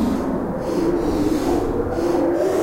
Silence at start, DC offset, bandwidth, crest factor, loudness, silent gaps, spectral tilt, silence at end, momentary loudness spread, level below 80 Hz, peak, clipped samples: 0 s; under 0.1%; 16 kHz; 12 dB; -21 LUFS; none; -7 dB/octave; 0 s; 4 LU; -34 dBFS; -8 dBFS; under 0.1%